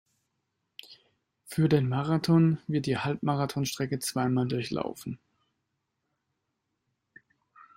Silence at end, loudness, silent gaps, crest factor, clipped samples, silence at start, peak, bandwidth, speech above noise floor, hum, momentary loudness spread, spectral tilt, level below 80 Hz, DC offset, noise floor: 2.6 s; -28 LUFS; none; 20 dB; under 0.1%; 0.9 s; -10 dBFS; 16 kHz; 54 dB; none; 17 LU; -6.5 dB/octave; -64 dBFS; under 0.1%; -81 dBFS